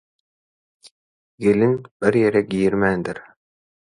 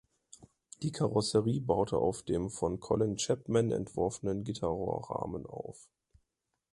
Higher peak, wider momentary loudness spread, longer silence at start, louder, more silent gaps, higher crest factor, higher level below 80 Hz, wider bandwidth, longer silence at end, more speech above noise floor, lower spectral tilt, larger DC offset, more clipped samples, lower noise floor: first, -4 dBFS vs -12 dBFS; about the same, 9 LU vs 10 LU; first, 1.4 s vs 0.4 s; first, -20 LUFS vs -33 LUFS; first, 1.91-2.00 s vs none; about the same, 18 dB vs 20 dB; about the same, -54 dBFS vs -56 dBFS; about the same, 11 kHz vs 11.5 kHz; second, 0.6 s vs 0.9 s; first, over 71 dB vs 52 dB; first, -7.5 dB/octave vs -6 dB/octave; neither; neither; first, under -90 dBFS vs -84 dBFS